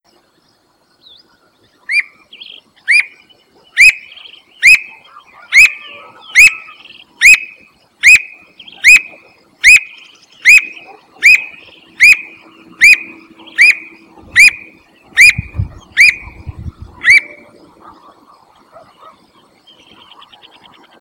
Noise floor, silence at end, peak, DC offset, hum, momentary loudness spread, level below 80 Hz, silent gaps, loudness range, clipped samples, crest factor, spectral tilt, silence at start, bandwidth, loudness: -55 dBFS; 3.8 s; 0 dBFS; under 0.1%; none; 21 LU; -42 dBFS; none; 8 LU; 3%; 12 dB; 0.5 dB/octave; 1.9 s; over 20 kHz; -7 LUFS